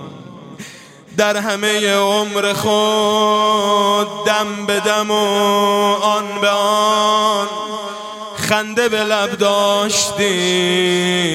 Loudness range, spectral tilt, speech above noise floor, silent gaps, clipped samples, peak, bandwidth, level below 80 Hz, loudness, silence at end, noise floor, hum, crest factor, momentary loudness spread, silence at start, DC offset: 2 LU; -3 dB/octave; 23 dB; none; under 0.1%; 0 dBFS; 16.5 kHz; -60 dBFS; -15 LUFS; 0 s; -38 dBFS; none; 16 dB; 11 LU; 0 s; under 0.1%